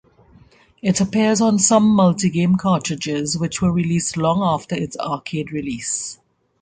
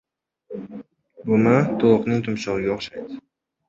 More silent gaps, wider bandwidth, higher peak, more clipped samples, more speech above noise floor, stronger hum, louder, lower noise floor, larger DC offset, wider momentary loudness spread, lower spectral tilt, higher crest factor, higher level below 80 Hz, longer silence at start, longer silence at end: neither; first, 9.6 kHz vs 7.6 kHz; about the same, -2 dBFS vs -2 dBFS; neither; first, 33 dB vs 25 dB; neither; about the same, -19 LUFS vs -20 LUFS; first, -51 dBFS vs -46 dBFS; neither; second, 11 LU vs 21 LU; second, -5 dB/octave vs -7.5 dB/octave; about the same, 18 dB vs 20 dB; first, -50 dBFS vs -56 dBFS; first, 0.85 s vs 0.5 s; about the same, 0.45 s vs 0.5 s